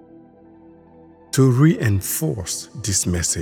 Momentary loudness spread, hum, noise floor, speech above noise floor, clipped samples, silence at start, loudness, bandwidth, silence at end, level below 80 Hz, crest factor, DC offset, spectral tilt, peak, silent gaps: 11 LU; none; -47 dBFS; 29 dB; under 0.1%; 1.35 s; -19 LUFS; 20 kHz; 0 s; -44 dBFS; 18 dB; under 0.1%; -5 dB/octave; -4 dBFS; none